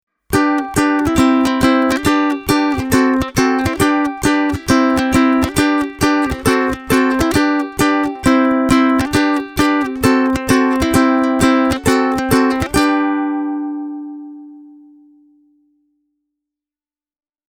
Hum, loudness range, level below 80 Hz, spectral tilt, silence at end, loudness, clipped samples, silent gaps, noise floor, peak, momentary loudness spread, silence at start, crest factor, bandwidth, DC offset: none; 6 LU; -36 dBFS; -5 dB/octave; 2.8 s; -15 LUFS; under 0.1%; none; under -90 dBFS; 0 dBFS; 4 LU; 0.3 s; 16 dB; 17.5 kHz; under 0.1%